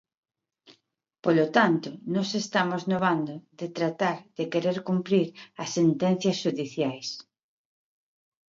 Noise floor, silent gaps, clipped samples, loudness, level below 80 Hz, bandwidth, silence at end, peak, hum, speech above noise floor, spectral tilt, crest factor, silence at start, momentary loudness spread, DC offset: -73 dBFS; none; under 0.1%; -27 LUFS; -74 dBFS; 7.6 kHz; 1.35 s; -6 dBFS; none; 47 dB; -5.5 dB/octave; 22 dB; 1.25 s; 12 LU; under 0.1%